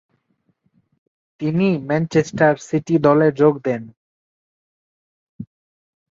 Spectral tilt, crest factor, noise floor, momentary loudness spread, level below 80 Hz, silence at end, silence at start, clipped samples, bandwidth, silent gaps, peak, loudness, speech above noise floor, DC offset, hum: -7.5 dB/octave; 20 dB; -67 dBFS; 24 LU; -60 dBFS; 0.7 s; 1.4 s; under 0.1%; 7.6 kHz; 3.97-5.39 s; -2 dBFS; -18 LUFS; 50 dB; under 0.1%; none